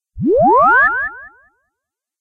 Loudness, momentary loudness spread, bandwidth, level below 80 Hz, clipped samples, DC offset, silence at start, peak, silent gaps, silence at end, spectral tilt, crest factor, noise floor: -12 LUFS; 11 LU; 6.2 kHz; -44 dBFS; under 0.1%; under 0.1%; 0.15 s; -2 dBFS; none; 0.9 s; -9 dB/octave; 12 dB; -80 dBFS